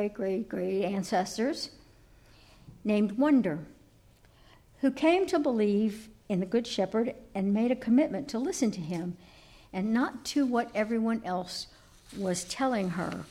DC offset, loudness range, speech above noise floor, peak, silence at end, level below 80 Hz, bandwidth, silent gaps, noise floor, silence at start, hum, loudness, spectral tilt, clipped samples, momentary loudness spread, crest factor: under 0.1%; 3 LU; 31 dB; -14 dBFS; 0 s; -62 dBFS; 14.5 kHz; none; -59 dBFS; 0 s; none; -30 LUFS; -5.5 dB/octave; under 0.1%; 12 LU; 16 dB